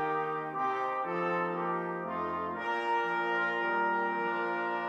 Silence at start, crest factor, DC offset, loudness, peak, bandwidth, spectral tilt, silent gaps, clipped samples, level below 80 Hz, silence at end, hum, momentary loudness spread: 0 s; 12 dB; under 0.1%; -32 LUFS; -20 dBFS; 8.8 kHz; -6.5 dB/octave; none; under 0.1%; -76 dBFS; 0 s; none; 5 LU